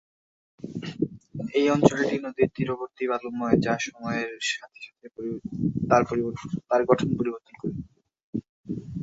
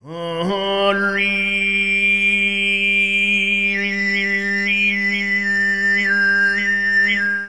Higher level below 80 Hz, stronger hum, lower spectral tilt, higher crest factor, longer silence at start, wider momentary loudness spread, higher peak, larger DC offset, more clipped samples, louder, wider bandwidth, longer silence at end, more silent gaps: second, -56 dBFS vs -50 dBFS; neither; first, -6 dB/octave vs -4 dB/octave; first, 24 dB vs 14 dB; first, 0.65 s vs 0 s; first, 15 LU vs 4 LU; about the same, -2 dBFS vs -4 dBFS; second, under 0.1% vs 0.6%; neither; second, -27 LUFS vs -16 LUFS; second, 8 kHz vs 11 kHz; about the same, 0 s vs 0 s; first, 8.23-8.33 s, 8.49-8.64 s vs none